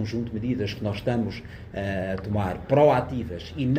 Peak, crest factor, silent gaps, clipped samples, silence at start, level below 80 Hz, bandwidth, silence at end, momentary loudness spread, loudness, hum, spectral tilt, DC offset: -8 dBFS; 18 dB; none; under 0.1%; 0 s; -46 dBFS; 15 kHz; 0 s; 13 LU; -26 LUFS; none; -8 dB/octave; under 0.1%